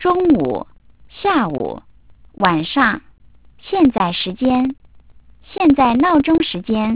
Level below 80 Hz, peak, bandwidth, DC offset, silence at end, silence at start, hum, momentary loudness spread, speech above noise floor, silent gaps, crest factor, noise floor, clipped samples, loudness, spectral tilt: -44 dBFS; 0 dBFS; 4 kHz; 0.4%; 0 s; 0 s; none; 13 LU; 32 dB; none; 18 dB; -48 dBFS; under 0.1%; -16 LUFS; -10 dB/octave